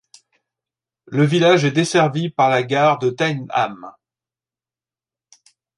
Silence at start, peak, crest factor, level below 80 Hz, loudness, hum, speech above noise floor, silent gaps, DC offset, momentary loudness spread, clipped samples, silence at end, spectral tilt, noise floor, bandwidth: 1.1 s; -2 dBFS; 18 dB; -68 dBFS; -17 LUFS; none; over 73 dB; none; under 0.1%; 8 LU; under 0.1%; 1.9 s; -5.5 dB/octave; under -90 dBFS; 11.5 kHz